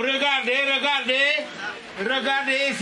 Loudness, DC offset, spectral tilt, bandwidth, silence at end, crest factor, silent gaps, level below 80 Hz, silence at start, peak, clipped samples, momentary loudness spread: -21 LUFS; under 0.1%; -2 dB/octave; 11.5 kHz; 0 s; 16 dB; none; -72 dBFS; 0 s; -8 dBFS; under 0.1%; 12 LU